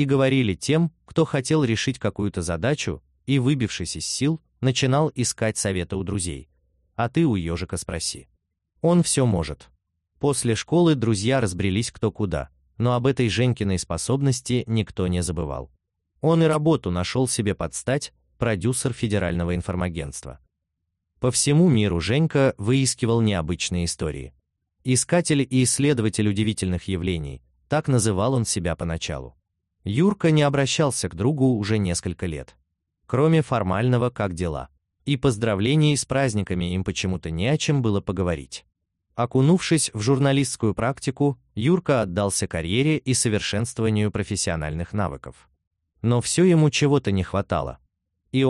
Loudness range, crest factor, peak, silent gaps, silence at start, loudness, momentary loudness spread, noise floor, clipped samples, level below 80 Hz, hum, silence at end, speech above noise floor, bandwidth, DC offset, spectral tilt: 3 LU; 14 dB; -8 dBFS; 45.67-45.71 s; 0 s; -23 LUFS; 10 LU; -79 dBFS; under 0.1%; -44 dBFS; none; 0 s; 57 dB; 12.5 kHz; under 0.1%; -5.5 dB/octave